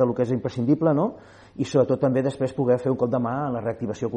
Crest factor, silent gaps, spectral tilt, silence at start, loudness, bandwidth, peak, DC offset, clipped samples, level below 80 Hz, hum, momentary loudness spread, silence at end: 16 dB; none; -8 dB/octave; 0 s; -24 LUFS; 9.4 kHz; -6 dBFS; under 0.1%; under 0.1%; -58 dBFS; none; 8 LU; 0 s